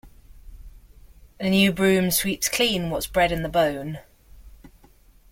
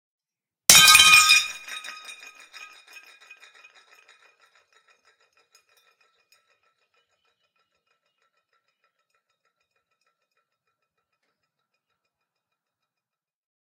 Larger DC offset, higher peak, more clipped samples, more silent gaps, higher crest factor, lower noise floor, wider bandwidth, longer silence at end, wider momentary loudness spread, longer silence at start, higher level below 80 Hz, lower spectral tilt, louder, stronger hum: neither; second, -4 dBFS vs 0 dBFS; neither; neither; second, 20 dB vs 26 dB; second, -54 dBFS vs under -90 dBFS; about the same, 16.5 kHz vs 16 kHz; second, 0.65 s vs 11.6 s; second, 12 LU vs 27 LU; second, 0.05 s vs 0.7 s; first, -44 dBFS vs -62 dBFS; first, -4 dB/octave vs 2 dB/octave; second, -22 LUFS vs -12 LUFS; neither